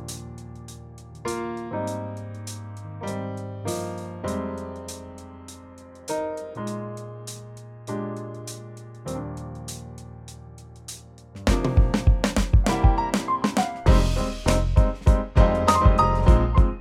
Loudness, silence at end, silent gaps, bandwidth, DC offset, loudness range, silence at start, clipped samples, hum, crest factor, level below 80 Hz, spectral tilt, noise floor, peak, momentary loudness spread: -24 LUFS; 0 s; none; 14 kHz; under 0.1%; 14 LU; 0 s; under 0.1%; none; 20 dB; -26 dBFS; -6 dB/octave; -44 dBFS; -4 dBFS; 22 LU